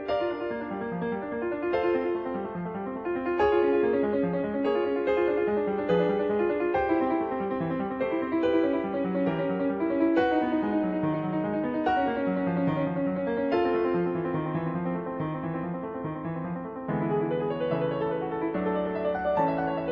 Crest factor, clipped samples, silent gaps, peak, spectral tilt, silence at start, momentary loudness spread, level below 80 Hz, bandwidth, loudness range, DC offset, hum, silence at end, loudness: 14 dB; under 0.1%; none; -12 dBFS; -9.5 dB/octave; 0 s; 8 LU; -56 dBFS; 5.8 kHz; 4 LU; under 0.1%; none; 0 s; -28 LUFS